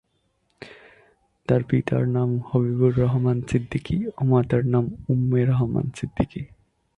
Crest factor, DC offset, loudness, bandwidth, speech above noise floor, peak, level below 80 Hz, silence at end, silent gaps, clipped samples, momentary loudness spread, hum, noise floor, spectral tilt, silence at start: 18 dB; under 0.1%; -23 LUFS; 9.2 kHz; 48 dB; -6 dBFS; -46 dBFS; 0.5 s; none; under 0.1%; 12 LU; none; -69 dBFS; -9 dB/octave; 0.6 s